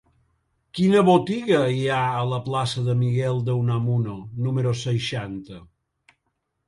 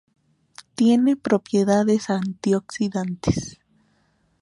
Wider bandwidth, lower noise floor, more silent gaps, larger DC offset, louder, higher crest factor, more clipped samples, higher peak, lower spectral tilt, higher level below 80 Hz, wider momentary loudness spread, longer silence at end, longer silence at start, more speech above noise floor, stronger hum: about the same, 11.5 kHz vs 11.5 kHz; first, -76 dBFS vs -65 dBFS; neither; neither; about the same, -22 LUFS vs -21 LUFS; about the same, 18 dB vs 18 dB; neither; about the same, -4 dBFS vs -6 dBFS; about the same, -7 dB/octave vs -6.5 dB/octave; second, -56 dBFS vs -48 dBFS; first, 12 LU vs 8 LU; first, 1.05 s vs 0.9 s; about the same, 0.75 s vs 0.8 s; first, 54 dB vs 44 dB; neither